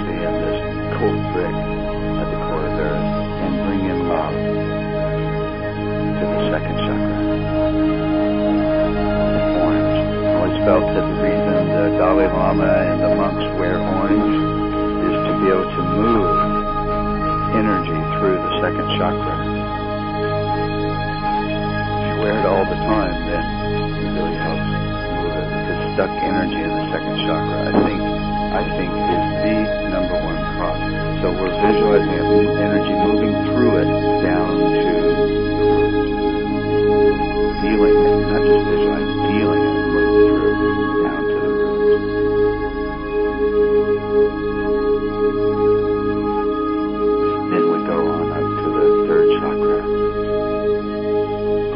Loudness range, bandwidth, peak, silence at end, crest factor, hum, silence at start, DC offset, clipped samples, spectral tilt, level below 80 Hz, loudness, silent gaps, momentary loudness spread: 5 LU; 5.4 kHz; -2 dBFS; 0 s; 16 dB; none; 0 s; under 0.1%; under 0.1%; -12 dB/octave; -32 dBFS; -18 LUFS; none; 6 LU